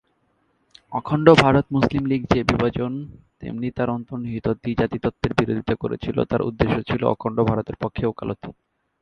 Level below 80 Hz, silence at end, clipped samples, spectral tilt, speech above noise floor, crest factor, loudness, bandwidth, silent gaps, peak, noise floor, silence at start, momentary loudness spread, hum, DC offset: -42 dBFS; 0.5 s; under 0.1%; -7.5 dB/octave; 45 dB; 22 dB; -22 LUFS; 9.6 kHz; none; 0 dBFS; -67 dBFS; 0.9 s; 13 LU; none; under 0.1%